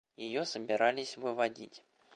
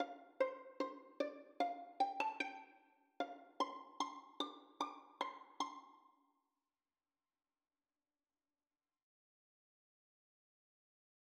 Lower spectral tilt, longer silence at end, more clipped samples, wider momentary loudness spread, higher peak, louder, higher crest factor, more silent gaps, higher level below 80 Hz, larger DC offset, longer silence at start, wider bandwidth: first, -3.5 dB/octave vs -1.5 dB/octave; second, 0.35 s vs 5.35 s; neither; first, 13 LU vs 6 LU; first, -14 dBFS vs -24 dBFS; first, -34 LUFS vs -45 LUFS; about the same, 22 dB vs 24 dB; neither; first, -84 dBFS vs under -90 dBFS; neither; first, 0.2 s vs 0 s; about the same, 10.5 kHz vs 10 kHz